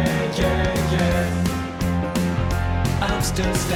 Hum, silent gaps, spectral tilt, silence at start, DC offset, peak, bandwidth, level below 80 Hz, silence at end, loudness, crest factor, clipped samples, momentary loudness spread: none; none; -5.5 dB/octave; 0 s; under 0.1%; -8 dBFS; 17 kHz; -30 dBFS; 0 s; -22 LUFS; 12 dB; under 0.1%; 3 LU